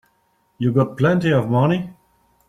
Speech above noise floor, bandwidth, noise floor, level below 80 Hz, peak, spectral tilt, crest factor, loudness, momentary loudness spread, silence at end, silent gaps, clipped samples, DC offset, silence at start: 46 dB; 9.4 kHz; -64 dBFS; -56 dBFS; -4 dBFS; -8.5 dB/octave; 16 dB; -19 LUFS; 7 LU; 0.55 s; none; under 0.1%; under 0.1%; 0.6 s